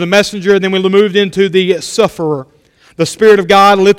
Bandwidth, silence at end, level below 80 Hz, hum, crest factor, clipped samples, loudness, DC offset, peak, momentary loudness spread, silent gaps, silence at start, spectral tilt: 15.5 kHz; 0 s; -48 dBFS; none; 10 dB; 0.7%; -10 LUFS; under 0.1%; 0 dBFS; 11 LU; none; 0 s; -4.5 dB/octave